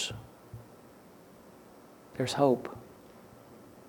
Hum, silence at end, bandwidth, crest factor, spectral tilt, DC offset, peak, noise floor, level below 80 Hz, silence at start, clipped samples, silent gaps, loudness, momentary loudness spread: none; 0.05 s; over 20 kHz; 24 dB; -5 dB/octave; under 0.1%; -12 dBFS; -55 dBFS; -66 dBFS; 0 s; under 0.1%; none; -30 LUFS; 27 LU